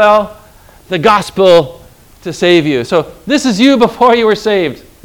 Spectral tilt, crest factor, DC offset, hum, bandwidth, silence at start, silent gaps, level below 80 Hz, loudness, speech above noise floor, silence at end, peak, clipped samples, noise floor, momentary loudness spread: -5 dB/octave; 10 dB; under 0.1%; none; 19.5 kHz; 0 s; none; -44 dBFS; -10 LUFS; 30 dB; 0.3 s; 0 dBFS; 1%; -40 dBFS; 12 LU